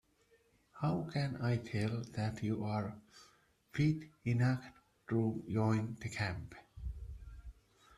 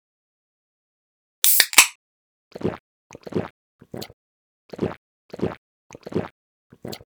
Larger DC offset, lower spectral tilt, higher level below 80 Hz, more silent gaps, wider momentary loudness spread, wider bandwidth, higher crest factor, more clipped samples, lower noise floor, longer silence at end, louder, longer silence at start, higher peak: neither; first, -7.5 dB/octave vs -1.5 dB/octave; about the same, -56 dBFS vs -58 dBFS; second, none vs 1.95-2.51 s, 2.80-3.10 s, 3.50-3.79 s, 4.13-4.69 s, 4.97-5.29 s, 5.58-5.90 s, 6.31-6.70 s; second, 18 LU vs 27 LU; second, 11.5 kHz vs over 20 kHz; second, 18 dB vs 26 dB; neither; second, -71 dBFS vs under -90 dBFS; first, 0.45 s vs 0.1 s; second, -37 LUFS vs -20 LUFS; second, 0.75 s vs 1.45 s; second, -20 dBFS vs 0 dBFS